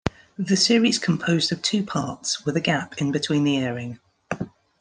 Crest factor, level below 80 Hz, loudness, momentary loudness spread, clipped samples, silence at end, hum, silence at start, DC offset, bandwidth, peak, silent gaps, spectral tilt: 20 dB; -54 dBFS; -23 LUFS; 14 LU; under 0.1%; 0.3 s; none; 0.05 s; under 0.1%; 10.5 kHz; -4 dBFS; none; -4 dB/octave